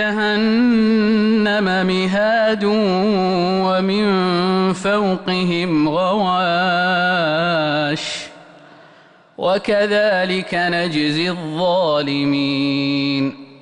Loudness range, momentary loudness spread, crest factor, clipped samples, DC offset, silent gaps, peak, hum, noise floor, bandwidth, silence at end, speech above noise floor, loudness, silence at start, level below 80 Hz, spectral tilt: 4 LU; 4 LU; 10 dB; under 0.1%; under 0.1%; none; -8 dBFS; none; -48 dBFS; 10 kHz; 0.1 s; 31 dB; -17 LUFS; 0 s; -54 dBFS; -6 dB/octave